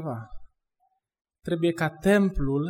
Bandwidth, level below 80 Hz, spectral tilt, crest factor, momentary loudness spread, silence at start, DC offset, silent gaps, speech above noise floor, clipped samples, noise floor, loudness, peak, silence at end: 16 kHz; -42 dBFS; -7 dB/octave; 18 dB; 16 LU; 0 s; under 0.1%; none; 48 dB; under 0.1%; -73 dBFS; -25 LUFS; -10 dBFS; 0 s